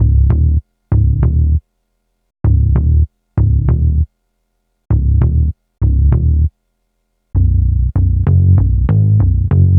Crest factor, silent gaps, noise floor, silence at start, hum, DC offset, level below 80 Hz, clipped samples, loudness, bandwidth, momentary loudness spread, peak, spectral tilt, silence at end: 12 dB; none; -66 dBFS; 0 s; none; under 0.1%; -16 dBFS; under 0.1%; -14 LUFS; 2.3 kHz; 7 LU; 0 dBFS; -13.5 dB/octave; 0 s